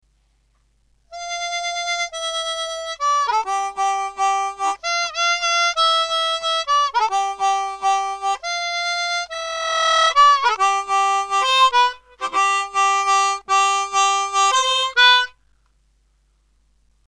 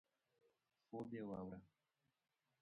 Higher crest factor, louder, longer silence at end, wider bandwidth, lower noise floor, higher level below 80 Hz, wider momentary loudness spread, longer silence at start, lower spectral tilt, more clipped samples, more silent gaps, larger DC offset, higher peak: about the same, 18 dB vs 18 dB; first, -18 LUFS vs -52 LUFS; first, 1.8 s vs 0.95 s; first, 13 kHz vs 5.2 kHz; second, -62 dBFS vs -89 dBFS; first, -58 dBFS vs -80 dBFS; first, 10 LU vs 7 LU; first, 1.1 s vs 0.9 s; second, 2.5 dB/octave vs -8 dB/octave; neither; neither; neither; first, -2 dBFS vs -38 dBFS